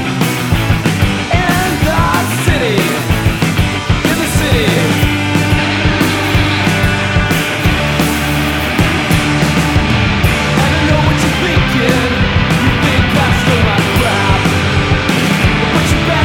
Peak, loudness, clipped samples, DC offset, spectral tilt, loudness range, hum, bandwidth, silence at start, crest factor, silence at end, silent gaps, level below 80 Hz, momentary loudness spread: 0 dBFS; -12 LUFS; under 0.1%; under 0.1%; -5 dB/octave; 1 LU; none; 18.5 kHz; 0 s; 12 dB; 0 s; none; -22 dBFS; 2 LU